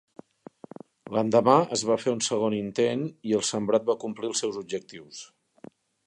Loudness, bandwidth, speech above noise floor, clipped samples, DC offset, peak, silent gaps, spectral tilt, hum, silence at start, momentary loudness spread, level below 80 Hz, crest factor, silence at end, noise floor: -26 LUFS; 11.5 kHz; 25 dB; under 0.1%; under 0.1%; -6 dBFS; none; -4.5 dB/octave; none; 1.05 s; 22 LU; -70 dBFS; 22 dB; 0.8 s; -51 dBFS